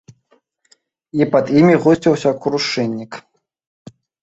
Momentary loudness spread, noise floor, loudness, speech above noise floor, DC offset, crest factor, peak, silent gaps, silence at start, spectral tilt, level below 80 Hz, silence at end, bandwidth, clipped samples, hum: 16 LU; -60 dBFS; -15 LUFS; 45 dB; under 0.1%; 16 dB; -2 dBFS; none; 1.15 s; -6.5 dB/octave; -56 dBFS; 1.05 s; 8 kHz; under 0.1%; none